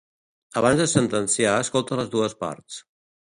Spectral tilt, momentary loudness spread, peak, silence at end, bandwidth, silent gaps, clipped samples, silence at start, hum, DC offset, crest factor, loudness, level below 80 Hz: -4 dB/octave; 15 LU; -2 dBFS; 0.55 s; 11.5 kHz; none; under 0.1%; 0.55 s; none; under 0.1%; 22 dB; -22 LUFS; -56 dBFS